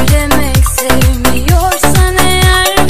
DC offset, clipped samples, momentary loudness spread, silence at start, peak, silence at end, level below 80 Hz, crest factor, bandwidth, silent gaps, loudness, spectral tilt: 10%; 0.3%; 3 LU; 0 s; 0 dBFS; 0 s; -14 dBFS; 10 dB; 16 kHz; none; -10 LUFS; -4 dB/octave